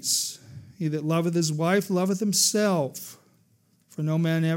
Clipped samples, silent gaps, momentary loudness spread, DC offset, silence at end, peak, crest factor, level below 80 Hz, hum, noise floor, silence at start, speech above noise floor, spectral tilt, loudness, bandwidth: under 0.1%; none; 15 LU; under 0.1%; 0 s; -8 dBFS; 18 dB; -74 dBFS; none; -64 dBFS; 0 s; 40 dB; -4 dB/octave; -25 LUFS; 16.5 kHz